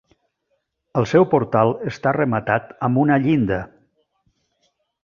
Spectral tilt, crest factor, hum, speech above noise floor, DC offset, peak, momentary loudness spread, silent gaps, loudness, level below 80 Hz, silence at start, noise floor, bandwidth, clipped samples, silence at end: -8 dB/octave; 18 dB; none; 54 dB; under 0.1%; -2 dBFS; 7 LU; none; -19 LUFS; -52 dBFS; 0.95 s; -72 dBFS; 7.2 kHz; under 0.1%; 1.4 s